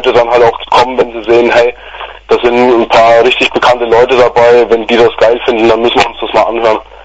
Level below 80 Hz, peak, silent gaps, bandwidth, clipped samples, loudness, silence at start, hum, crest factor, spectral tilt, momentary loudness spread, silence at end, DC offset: -36 dBFS; 0 dBFS; none; 8 kHz; 0.7%; -8 LUFS; 0 s; none; 8 dB; -4.5 dB/octave; 6 LU; 0.2 s; 0.5%